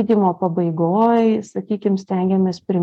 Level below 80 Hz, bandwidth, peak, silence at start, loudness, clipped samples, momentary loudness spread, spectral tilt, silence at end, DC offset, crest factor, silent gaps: -62 dBFS; 8 kHz; -4 dBFS; 0 s; -18 LUFS; under 0.1%; 7 LU; -8.5 dB/octave; 0 s; under 0.1%; 12 dB; none